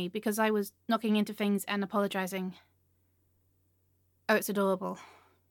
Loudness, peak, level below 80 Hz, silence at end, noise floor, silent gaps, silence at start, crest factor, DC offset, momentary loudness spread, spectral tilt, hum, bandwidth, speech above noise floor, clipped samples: -31 LUFS; -12 dBFS; -82 dBFS; 0.45 s; -72 dBFS; none; 0 s; 22 dB; under 0.1%; 10 LU; -5 dB/octave; none; 17.5 kHz; 41 dB; under 0.1%